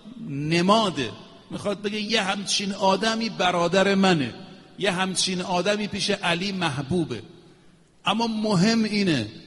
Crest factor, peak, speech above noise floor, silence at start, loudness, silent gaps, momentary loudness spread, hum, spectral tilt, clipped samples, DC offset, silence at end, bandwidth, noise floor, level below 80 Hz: 18 dB; -6 dBFS; 32 dB; 0.05 s; -23 LUFS; none; 11 LU; none; -4.5 dB/octave; under 0.1%; under 0.1%; 0 s; 11.5 kHz; -55 dBFS; -58 dBFS